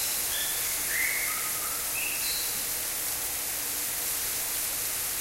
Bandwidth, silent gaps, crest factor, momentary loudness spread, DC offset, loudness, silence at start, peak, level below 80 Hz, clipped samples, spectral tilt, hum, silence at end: 16 kHz; none; 16 dB; 3 LU; under 0.1%; -27 LUFS; 0 s; -16 dBFS; -54 dBFS; under 0.1%; 1 dB/octave; none; 0 s